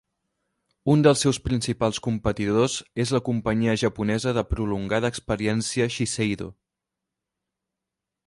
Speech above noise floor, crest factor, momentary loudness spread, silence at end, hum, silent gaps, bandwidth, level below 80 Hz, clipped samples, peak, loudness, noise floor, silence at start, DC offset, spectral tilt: 62 dB; 20 dB; 8 LU; 1.75 s; none; none; 11.5 kHz; -44 dBFS; under 0.1%; -4 dBFS; -24 LUFS; -86 dBFS; 0.85 s; under 0.1%; -5.5 dB/octave